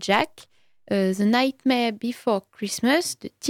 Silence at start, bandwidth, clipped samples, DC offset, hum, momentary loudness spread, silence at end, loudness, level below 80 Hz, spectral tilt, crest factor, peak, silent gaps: 0 s; 17 kHz; under 0.1%; under 0.1%; none; 8 LU; 0 s; -23 LUFS; -66 dBFS; -4 dB/octave; 18 dB; -6 dBFS; none